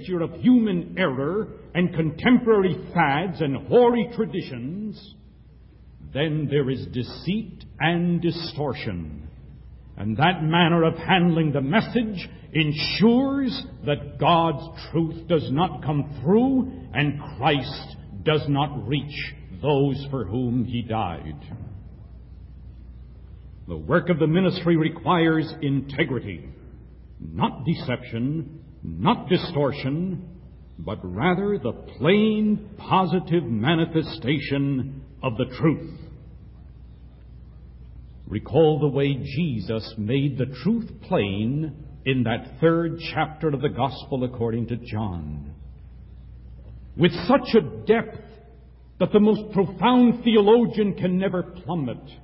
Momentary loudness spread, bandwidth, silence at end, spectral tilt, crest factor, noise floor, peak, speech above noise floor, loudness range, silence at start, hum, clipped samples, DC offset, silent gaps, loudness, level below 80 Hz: 15 LU; 5.8 kHz; 0 s; -11 dB/octave; 18 dB; -49 dBFS; -4 dBFS; 26 dB; 7 LU; 0 s; none; under 0.1%; under 0.1%; none; -23 LUFS; -46 dBFS